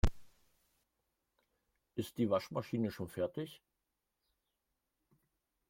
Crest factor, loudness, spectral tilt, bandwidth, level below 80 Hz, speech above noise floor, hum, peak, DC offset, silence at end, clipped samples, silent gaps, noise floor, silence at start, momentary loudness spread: 24 dB; -39 LUFS; -7 dB/octave; 16.5 kHz; -50 dBFS; 49 dB; none; -18 dBFS; under 0.1%; 2.15 s; under 0.1%; none; -87 dBFS; 0.05 s; 11 LU